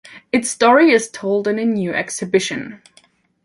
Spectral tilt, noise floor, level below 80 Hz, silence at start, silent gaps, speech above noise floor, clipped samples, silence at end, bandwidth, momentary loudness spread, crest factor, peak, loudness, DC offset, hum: -4 dB/octave; -55 dBFS; -62 dBFS; 0.1 s; none; 38 dB; under 0.1%; 0.7 s; 11.5 kHz; 11 LU; 16 dB; -2 dBFS; -17 LUFS; under 0.1%; none